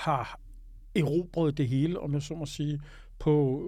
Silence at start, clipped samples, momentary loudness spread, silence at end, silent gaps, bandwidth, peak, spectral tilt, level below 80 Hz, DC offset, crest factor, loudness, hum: 0 s; under 0.1%; 10 LU; 0 s; none; 13 kHz; -14 dBFS; -7.5 dB/octave; -48 dBFS; under 0.1%; 14 dB; -30 LUFS; none